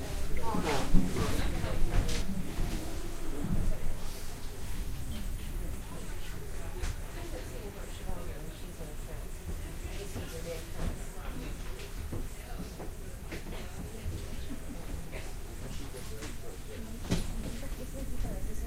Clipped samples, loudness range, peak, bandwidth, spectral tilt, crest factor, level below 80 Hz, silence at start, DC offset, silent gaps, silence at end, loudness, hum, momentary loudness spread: under 0.1%; 8 LU; -8 dBFS; 16 kHz; -5 dB/octave; 24 dB; -36 dBFS; 0 s; under 0.1%; none; 0 s; -39 LUFS; none; 10 LU